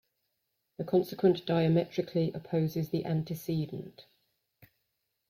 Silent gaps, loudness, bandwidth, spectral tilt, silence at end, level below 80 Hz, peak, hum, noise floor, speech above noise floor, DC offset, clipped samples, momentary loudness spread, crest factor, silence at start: none; -31 LUFS; 16 kHz; -8 dB/octave; 1.3 s; -68 dBFS; -14 dBFS; none; -81 dBFS; 51 dB; under 0.1%; under 0.1%; 11 LU; 18 dB; 0.8 s